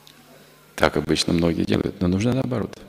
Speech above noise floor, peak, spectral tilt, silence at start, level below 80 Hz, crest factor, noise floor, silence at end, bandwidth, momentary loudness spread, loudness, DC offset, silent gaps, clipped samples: 28 dB; -2 dBFS; -5.5 dB/octave; 0.75 s; -46 dBFS; 22 dB; -50 dBFS; 0 s; 16 kHz; 4 LU; -22 LUFS; under 0.1%; none; under 0.1%